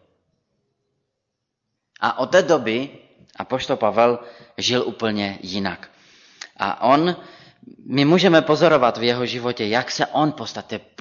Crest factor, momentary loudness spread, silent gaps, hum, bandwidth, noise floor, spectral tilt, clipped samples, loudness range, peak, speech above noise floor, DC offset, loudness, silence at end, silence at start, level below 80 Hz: 18 dB; 16 LU; none; none; 7.4 kHz; -79 dBFS; -5 dB/octave; under 0.1%; 5 LU; -4 dBFS; 59 dB; under 0.1%; -20 LUFS; 0.2 s; 2 s; -62 dBFS